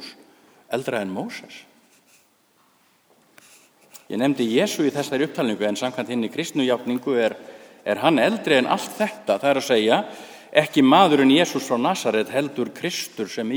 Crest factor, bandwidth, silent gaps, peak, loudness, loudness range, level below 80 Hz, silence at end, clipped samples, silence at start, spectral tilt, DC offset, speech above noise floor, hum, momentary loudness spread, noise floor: 22 dB; over 20 kHz; none; 0 dBFS; -21 LUFS; 14 LU; -72 dBFS; 0 s; under 0.1%; 0 s; -4.5 dB/octave; under 0.1%; 40 dB; none; 13 LU; -61 dBFS